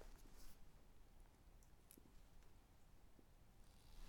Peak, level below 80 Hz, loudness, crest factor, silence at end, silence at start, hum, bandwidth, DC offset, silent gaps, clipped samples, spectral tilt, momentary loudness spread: -42 dBFS; -66 dBFS; -67 LUFS; 20 dB; 0 s; 0 s; none; 19 kHz; under 0.1%; none; under 0.1%; -4 dB/octave; 2 LU